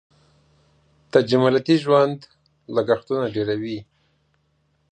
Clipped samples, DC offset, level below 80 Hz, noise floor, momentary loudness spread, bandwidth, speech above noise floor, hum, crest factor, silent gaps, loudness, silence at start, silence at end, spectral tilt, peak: under 0.1%; under 0.1%; -62 dBFS; -66 dBFS; 11 LU; 9.4 kHz; 47 dB; none; 22 dB; none; -20 LUFS; 1.15 s; 1.1 s; -7 dB/octave; -2 dBFS